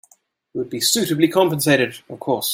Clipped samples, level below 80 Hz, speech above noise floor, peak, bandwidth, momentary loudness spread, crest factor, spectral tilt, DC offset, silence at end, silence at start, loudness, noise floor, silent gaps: under 0.1%; -64 dBFS; 39 dB; -2 dBFS; 16.5 kHz; 13 LU; 18 dB; -3.5 dB/octave; under 0.1%; 0 s; 0.55 s; -18 LUFS; -58 dBFS; none